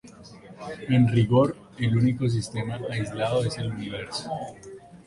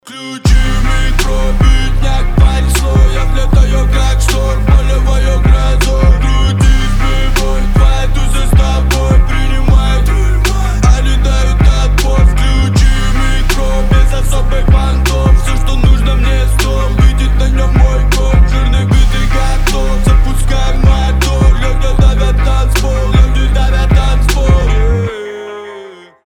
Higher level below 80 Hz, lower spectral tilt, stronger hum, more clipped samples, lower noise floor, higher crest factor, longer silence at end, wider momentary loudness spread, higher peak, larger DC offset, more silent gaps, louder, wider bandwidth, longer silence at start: second, -52 dBFS vs -10 dBFS; first, -7 dB/octave vs -5.5 dB/octave; neither; neither; first, -46 dBFS vs -32 dBFS; first, 18 dB vs 8 dB; second, 0.05 s vs 0.3 s; first, 19 LU vs 4 LU; second, -8 dBFS vs 0 dBFS; neither; neither; second, -25 LUFS vs -12 LUFS; second, 11.5 kHz vs 15 kHz; about the same, 0.05 s vs 0.05 s